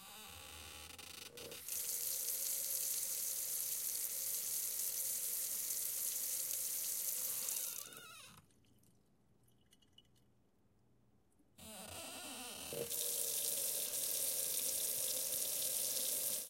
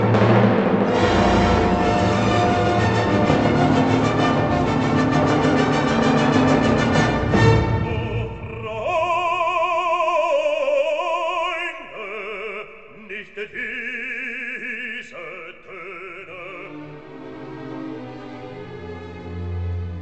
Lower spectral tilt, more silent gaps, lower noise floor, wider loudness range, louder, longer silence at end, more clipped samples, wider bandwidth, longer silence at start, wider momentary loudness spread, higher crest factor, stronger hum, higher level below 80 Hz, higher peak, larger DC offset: second, 0.5 dB/octave vs -6.5 dB/octave; neither; first, -75 dBFS vs -40 dBFS; second, 13 LU vs 16 LU; second, -38 LUFS vs -19 LUFS; about the same, 0 s vs 0 s; neither; first, 17 kHz vs 8.8 kHz; about the same, 0 s vs 0 s; second, 15 LU vs 18 LU; about the same, 22 dB vs 18 dB; neither; second, -80 dBFS vs -38 dBFS; second, -20 dBFS vs -4 dBFS; second, under 0.1% vs 0.3%